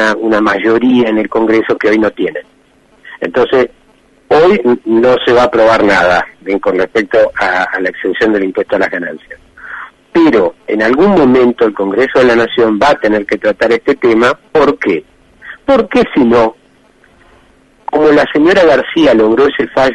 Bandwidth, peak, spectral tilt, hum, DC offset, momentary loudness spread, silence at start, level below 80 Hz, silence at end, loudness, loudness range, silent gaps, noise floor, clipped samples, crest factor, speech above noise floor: 10 kHz; 0 dBFS; -6 dB/octave; none; under 0.1%; 9 LU; 0 s; -42 dBFS; 0 s; -10 LUFS; 4 LU; none; -48 dBFS; under 0.1%; 10 dB; 38 dB